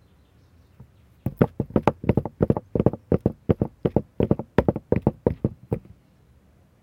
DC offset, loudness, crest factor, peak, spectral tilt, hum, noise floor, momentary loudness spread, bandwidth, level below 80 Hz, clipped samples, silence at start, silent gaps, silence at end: under 0.1%; -25 LUFS; 26 dB; 0 dBFS; -10 dB/octave; none; -57 dBFS; 8 LU; 16.5 kHz; -40 dBFS; under 0.1%; 0.8 s; none; 1.05 s